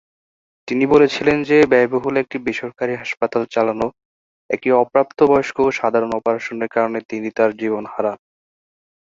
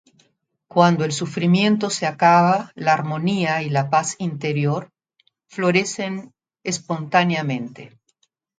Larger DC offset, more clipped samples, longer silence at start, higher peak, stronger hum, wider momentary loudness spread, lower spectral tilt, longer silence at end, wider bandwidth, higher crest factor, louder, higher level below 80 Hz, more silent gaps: neither; neither; about the same, 0.65 s vs 0.75 s; about the same, -2 dBFS vs 0 dBFS; neither; about the same, 11 LU vs 11 LU; about the same, -6 dB/octave vs -5 dB/octave; first, 1.05 s vs 0.7 s; second, 7.6 kHz vs 9.4 kHz; about the same, 16 dB vs 20 dB; about the same, -18 LUFS vs -20 LUFS; first, -56 dBFS vs -66 dBFS; first, 4.05-4.49 s, 7.05-7.09 s vs none